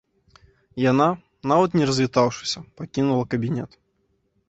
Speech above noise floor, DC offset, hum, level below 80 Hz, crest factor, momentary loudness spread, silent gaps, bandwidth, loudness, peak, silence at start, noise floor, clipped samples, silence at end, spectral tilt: 48 dB; under 0.1%; none; -58 dBFS; 20 dB; 12 LU; none; 8.2 kHz; -22 LUFS; -4 dBFS; 0.75 s; -69 dBFS; under 0.1%; 0.8 s; -6 dB/octave